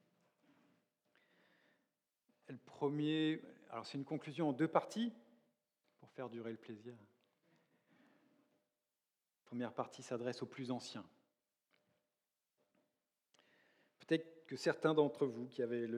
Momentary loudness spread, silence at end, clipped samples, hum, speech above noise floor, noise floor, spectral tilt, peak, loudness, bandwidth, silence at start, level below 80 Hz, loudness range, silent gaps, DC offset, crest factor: 17 LU; 0 s; under 0.1%; none; over 49 dB; under -90 dBFS; -6 dB/octave; -18 dBFS; -41 LUFS; 11.5 kHz; 2.5 s; under -90 dBFS; 14 LU; none; under 0.1%; 26 dB